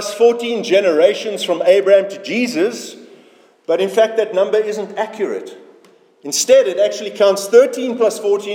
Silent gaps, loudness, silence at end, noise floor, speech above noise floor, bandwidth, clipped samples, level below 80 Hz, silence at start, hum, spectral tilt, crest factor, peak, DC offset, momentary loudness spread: none; -15 LUFS; 0 s; -49 dBFS; 34 dB; 17 kHz; under 0.1%; -74 dBFS; 0 s; none; -3 dB/octave; 16 dB; 0 dBFS; under 0.1%; 11 LU